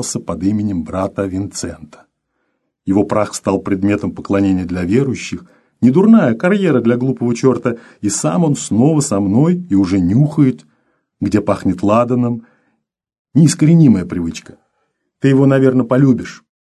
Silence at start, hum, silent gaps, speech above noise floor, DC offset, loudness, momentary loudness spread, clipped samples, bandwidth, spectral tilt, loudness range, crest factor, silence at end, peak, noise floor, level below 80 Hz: 0 s; none; 13.19-13.25 s; 55 dB; under 0.1%; -14 LUFS; 12 LU; under 0.1%; 12.5 kHz; -7 dB/octave; 5 LU; 14 dB; 0.3 s; 0 dBFS; -69 dBFS; -42 dBFS